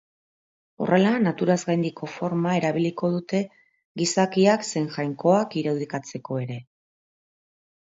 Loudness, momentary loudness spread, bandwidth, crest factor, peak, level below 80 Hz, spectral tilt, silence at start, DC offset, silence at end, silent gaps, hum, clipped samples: -24 LUFS; 11 LU; 8 kHz; 18 dB; -6 dBFS; -70 dBFS; -5.5 dB/octave; 0.8 s; under 0.1%; 1.2 s; 3.85-3.95 s; none; under 0.1%